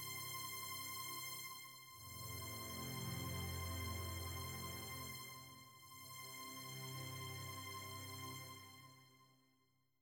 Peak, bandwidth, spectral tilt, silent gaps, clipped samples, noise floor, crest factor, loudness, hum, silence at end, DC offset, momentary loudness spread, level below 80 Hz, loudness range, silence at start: -34 dBFS; over 20 kHz; -3 dB/octave; none; under 0.1%; -81 dBFS; 16 dB; -48 LUFS; none; 0.65 s; under 0.1%; 11 LU; -68 dBFS; 4 LU; 0 s